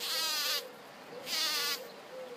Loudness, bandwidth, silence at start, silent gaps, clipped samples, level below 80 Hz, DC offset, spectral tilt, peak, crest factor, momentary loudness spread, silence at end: -32 LUFS; 15.5 kHz; 0 s; none; under 0.1%; -88 dBFS; under 0.1%; 1 dB/octave; -18 dBFS; 18 dB; 18 LU; 0 s